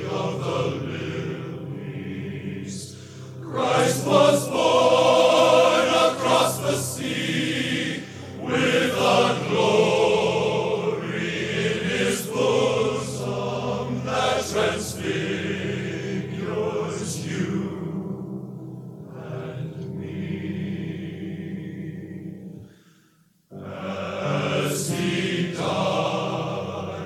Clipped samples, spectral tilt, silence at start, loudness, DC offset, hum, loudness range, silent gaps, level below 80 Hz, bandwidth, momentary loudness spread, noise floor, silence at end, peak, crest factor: under 0.1%; -4.5 dB/octave; 0 s; -23 LUFS; under 0.1%; none; 14 LU; none; -60 dBFS; 15.5 kHz; 16 LU; -60 dBFS; 0 s; -6 dBFS; 18 dB